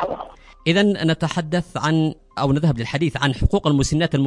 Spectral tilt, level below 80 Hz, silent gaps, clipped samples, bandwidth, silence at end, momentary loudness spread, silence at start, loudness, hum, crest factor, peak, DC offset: -6 dB/octave; -34 dBFS; none; under 0.1%; 11.5 kHz; 0 s; 7 LU; 0 s; -20 LUFS; none; 18 dB; -2 dBFS; under 0.1%